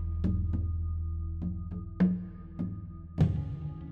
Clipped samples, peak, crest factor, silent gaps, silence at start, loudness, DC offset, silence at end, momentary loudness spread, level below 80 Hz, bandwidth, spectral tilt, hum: under 0.1%; -14 dBFS; 18 dB; none; 0 s; -33 LUFS; under 0.1%; 0 s; 11 LU; -38 dBFS; 4.8 kHz; -10.5 dB/octave; none